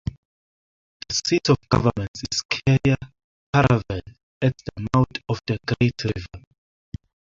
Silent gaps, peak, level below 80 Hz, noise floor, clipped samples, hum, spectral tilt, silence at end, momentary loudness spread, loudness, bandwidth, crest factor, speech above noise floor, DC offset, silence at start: 0.17-1.00 s, 2.08-2.14 s, 2.45-2.49 s, 3.24-3.53 s, 4.23-4.41 s; -2 dBFS; -44 dBFS; under -90 dBFS; under 0.1%; none; -5.5 dB/octave; 0.95 s; 17 LU; -23 LUFS; 7.6 kHz; 22 dB; over 69 dB; under 0.1%; 0.05 s